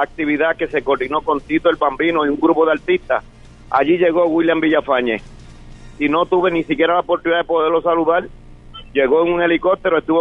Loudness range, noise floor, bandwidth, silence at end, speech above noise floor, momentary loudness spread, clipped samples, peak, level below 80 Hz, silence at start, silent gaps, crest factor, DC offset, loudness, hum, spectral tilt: 1 LU; -37 dBFS; 6.2 kHz; 0 s; 21 dB; 5 LU; under 0.1%; 0 dBFS; -46 dBFS; 0 s; none; 16 dB; under 0.1%; -17 LUFS; none; -7 dB/octave